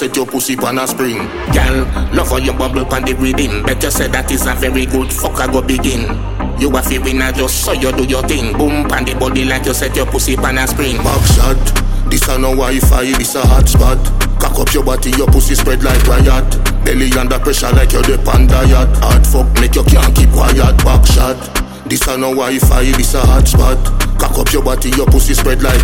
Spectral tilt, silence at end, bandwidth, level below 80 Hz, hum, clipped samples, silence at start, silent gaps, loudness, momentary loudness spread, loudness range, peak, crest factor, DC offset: -4.5 dB/octave; 0 s; 17 kHz; -12 dBFS; none; under 0.1%; 0 s; none; -12 LUFS; 6 LU; 4 LU; 0 dBFS; 10 dB; under 0.1%